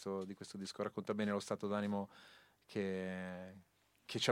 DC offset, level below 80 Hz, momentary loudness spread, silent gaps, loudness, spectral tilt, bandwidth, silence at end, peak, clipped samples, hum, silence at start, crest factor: under 0.1%; -84 dBFS; 15 LU; none; -42 LUFS; -5 dB/octave; 15.5 kHz; 0 s; -18 dBFS; under 0.1%; none; 0 s; 24 dB